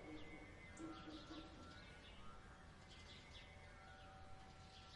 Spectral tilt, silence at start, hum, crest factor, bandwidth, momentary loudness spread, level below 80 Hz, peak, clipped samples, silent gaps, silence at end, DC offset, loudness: -4.5 dB/octave; 0 s; none; 16 dB; 11 kHz; 6 LU; -66 dBFS; -42 dBFS; under 0.1%; none; 0 s; under 0.1%; -59 LUFS